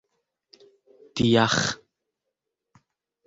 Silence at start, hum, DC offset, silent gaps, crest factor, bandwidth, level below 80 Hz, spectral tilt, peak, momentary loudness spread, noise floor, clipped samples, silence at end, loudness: 1.15 s; none; under 0.1%; none; 22 dB; 8 kHz; -56 dBFS; -4.5 dB/octave; -6 dBFS; 18 LU; -83 dBFS; under 0.1%; 1.5 s; -22 LUFS